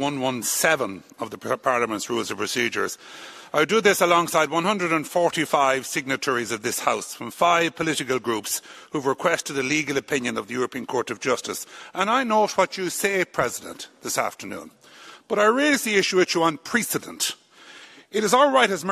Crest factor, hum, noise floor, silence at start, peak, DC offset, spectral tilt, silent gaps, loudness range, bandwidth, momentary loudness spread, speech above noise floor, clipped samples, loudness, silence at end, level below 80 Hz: 22 dB; none; -47 dBFS; 0 s; -2 dBFS; under 0.1%; -3 dB/octave; none; 4 LU; 14 kHz; 13 LU; 24 dB; under 0.1%; -23 LUFS; 0 s; -66 dBFS